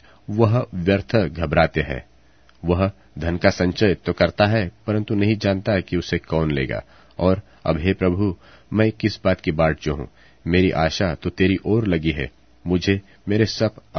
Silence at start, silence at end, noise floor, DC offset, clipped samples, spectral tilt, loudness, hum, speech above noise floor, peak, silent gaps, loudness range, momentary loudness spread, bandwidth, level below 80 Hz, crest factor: 0.3 s; 0 s; -55 dBFS; 0.2%; under 0.1%; -7 dB/octave; -21 LUFS; none; 34 dB; 0 dBFS; none; 2 LU; 9 LU; 6.6 kHz; -40 dBFS; 20 dB